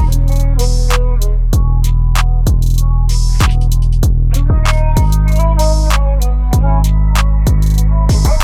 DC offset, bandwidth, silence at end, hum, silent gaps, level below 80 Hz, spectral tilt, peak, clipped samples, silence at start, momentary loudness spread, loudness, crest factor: under 0.1%; 14.5 kHz; 0 s; none; none; -10 dBFS; -5.5 dB/octave; 0 dBFS; under 0.1%; 0 s; 2 LU; -13 LUFS; 10 dB